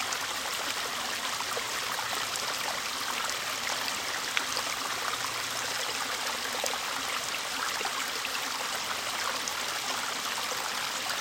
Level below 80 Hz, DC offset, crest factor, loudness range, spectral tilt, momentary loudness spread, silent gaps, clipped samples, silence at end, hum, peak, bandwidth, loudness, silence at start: -66 dBFS; under 0.1%; 28 dB; 0 LU; 0.5 dB/octave; 1 LU; none; under 0.1%; 0 s; none; -6 dBFS; 17 kHz; -30 LUFS; 0 s